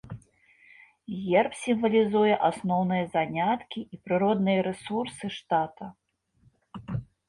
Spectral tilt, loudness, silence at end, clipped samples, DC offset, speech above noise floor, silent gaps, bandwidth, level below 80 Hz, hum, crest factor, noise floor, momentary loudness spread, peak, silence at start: -6.5 dB/octave; -27 LUFS; 0.25 s; under 0.1%; under 0.1%; 39 dB; none; 11.5 kHz; -60 dBFS; none; 18 dB; -65 dBFS; 21 LU; -10 dBFS; 0.05 s